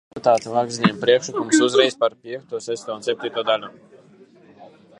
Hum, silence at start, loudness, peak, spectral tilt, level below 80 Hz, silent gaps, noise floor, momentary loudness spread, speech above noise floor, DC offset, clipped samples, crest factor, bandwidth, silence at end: none; 0.15 s; -20 LUFS; -2 dBFS; -4 dB/octave; -70 dBFS; none; -50 dBFS; 12 LU; 29 dB; under 0.1%; under 0.1%; 20 dB; 11.5 kHz; 0.35 s